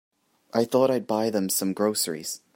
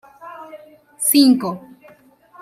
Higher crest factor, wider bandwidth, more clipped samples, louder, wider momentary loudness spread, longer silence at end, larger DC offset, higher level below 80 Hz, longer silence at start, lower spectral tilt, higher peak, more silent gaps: about the same, 18 dB vs 18 dB; about the same, 16.5 kHz vs 16 kHz; neither; second, -25 LUFS vs -15 LUFS; second, 6 LU vs 25 LU; second, 0.2 s vs 0.85 s; neither; about the same, -74 dBFS vs -70 dBFS; first, 0.55 s vs 0.25 s; about the same, -4 dB/octave vs -3 dB/octave; second, -8 dBFS vs -2 dBFS; neither